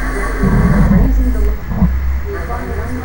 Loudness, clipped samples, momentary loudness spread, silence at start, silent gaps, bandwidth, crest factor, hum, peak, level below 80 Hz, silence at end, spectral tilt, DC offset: -16 LUFS; under 0.1%; 10 LU; 0 s; none; 16.5 kHz; 12 dB; none; 0 dBFS; -16 dBFS; 0 s; -8 dB/octave; under 0.1%